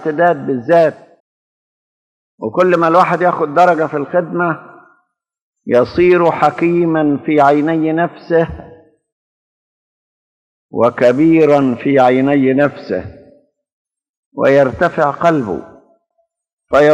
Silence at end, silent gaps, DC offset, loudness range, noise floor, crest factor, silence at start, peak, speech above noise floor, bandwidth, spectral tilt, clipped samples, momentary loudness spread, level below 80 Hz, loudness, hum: 0 s; 1.20-2.38 s, 5.42-5.53 s, 9.12-10.69 s, 13.72-13.85 s, 14.09-14.31 s, 16.53-16.58 s; under 0.1%; 4 LU; -66 dBFS; 14 dB; 0 s; 0 dBFS; 53 dB; 8.8 kHz; -8 dB/octave; under 0.1%; 11 LU; -50 dBFS; -13 LUFS; none